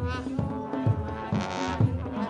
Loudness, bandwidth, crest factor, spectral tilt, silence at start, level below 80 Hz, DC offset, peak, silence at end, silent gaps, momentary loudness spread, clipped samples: -29 LUFS; 9 kHz; 18 dB; -7 dB/octave; 0 s; -46 dBFS; under 0.1%; -10 dBFS; 0 s; none; 5 LU; under 0.1%